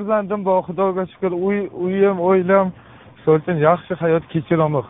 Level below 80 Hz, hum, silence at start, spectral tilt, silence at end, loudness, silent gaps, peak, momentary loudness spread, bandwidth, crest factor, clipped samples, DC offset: -56 dBFS; none; 0 s; -7 dB/octave; 0 s; -19 LUFS; none; 0 dBFS; 7 LU; 3.9 kHz; 18 dB; under 0.1%; under 0.1%